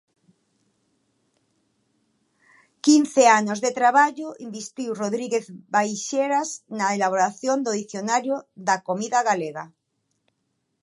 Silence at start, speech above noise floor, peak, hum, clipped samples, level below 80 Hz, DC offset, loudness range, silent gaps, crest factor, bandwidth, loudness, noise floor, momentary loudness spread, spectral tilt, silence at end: 2.85 s; 53 dB; -2 dBFS; none; under 0.1%; -80 dBFS; under 0.1%; 5 LU; none; 22 dB; 11.5 kHz; -22 LUFS; -75 dBFS; 14 LU; -3.5 dB/octave; 1.15 s